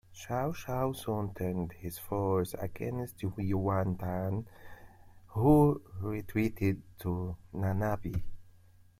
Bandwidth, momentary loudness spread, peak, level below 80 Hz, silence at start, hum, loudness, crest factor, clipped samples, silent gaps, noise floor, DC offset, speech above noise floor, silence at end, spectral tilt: 16 kHz; 10 LU; -12 dBFS; -50 dBFS; 0.1 s; none; -33 LUFS; 20 dB; under 0.1%; none; -59 dBFS; under 0.1%; 27 dB; 0.5 s; -8 dB/octave